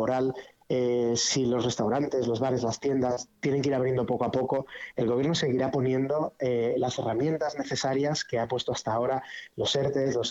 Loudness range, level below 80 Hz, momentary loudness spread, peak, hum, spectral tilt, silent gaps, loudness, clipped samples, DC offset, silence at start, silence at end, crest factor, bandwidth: 2 LU; -60 dBFS; 5 LU; -14 dBFS; none; -5 dB/octave; none; -28 LUFS; under 0.1%; under 0.1%; 0 s; 0 s; 12 dB; 8.2 kHz